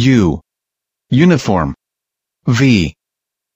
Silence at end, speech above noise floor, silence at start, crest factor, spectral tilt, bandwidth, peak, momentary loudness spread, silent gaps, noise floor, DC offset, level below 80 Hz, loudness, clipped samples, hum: 0.65 s; 71 dB; 0 s; 14 dB; -6.5 dB/octave; 15.5 kHz; 0 dBFS; 12 LU; none; -82 dBFS; under 0.1%; -36 dBFS; -14 LUFS; under 0.1%; none